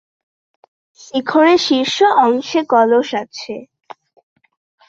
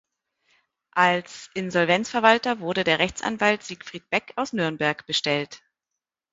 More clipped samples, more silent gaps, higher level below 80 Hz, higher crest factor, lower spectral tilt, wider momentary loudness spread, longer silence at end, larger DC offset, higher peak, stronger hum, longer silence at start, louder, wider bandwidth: neither; neither; about the same, -64 dBFS vs -60 dBFS; second, 16 dB vs 24 dB; about the same, -3.5 dB/octave vs -4 dB/octave; first, 16 LU vs 11 LU; first, 1.25 s vs 0.75 s; neither; about the same, -2 dBFS vs 0 dBFS; neither; first, 1.15 s vs 0.95 s; first, -14 LUFS vs -23 LUFS; about the same, 7.8 kHz vs 8 kHz